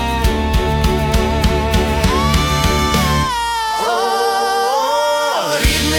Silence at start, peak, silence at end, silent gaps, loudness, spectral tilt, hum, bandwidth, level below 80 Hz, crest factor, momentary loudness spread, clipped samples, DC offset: 0 s; -2 dBFS; 0 s; none; -15 LUFS; -4.5 dB/octave; none; 18 kHz; -22 dBFS; 12 dB; 2 LU; under 0.1%; under 0.1%